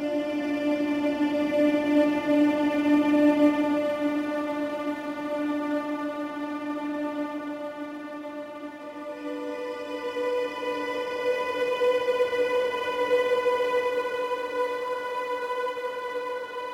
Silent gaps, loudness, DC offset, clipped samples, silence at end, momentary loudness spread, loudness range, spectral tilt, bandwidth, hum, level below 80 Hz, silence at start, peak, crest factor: none; -27 LUFS; under 0.1%; under 0.1%; 0 s; 12 LU; 10 LU; -5 dB/octave; 15 kHz; none; -66 dBFS; 0 s; -10 dBFS; 18 dB